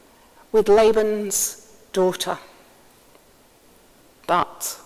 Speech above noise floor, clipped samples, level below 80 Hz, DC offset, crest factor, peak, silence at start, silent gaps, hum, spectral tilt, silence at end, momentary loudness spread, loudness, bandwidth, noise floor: 34 dB; under 0.1%; -54 dBFS; under 0.1%; 18 dB; -4 dBFS; 0.55 s; none; none; -3 dB/octave; 0.1 s; 14 LU; -21 LUFS; 16 kHz; -54 dBFS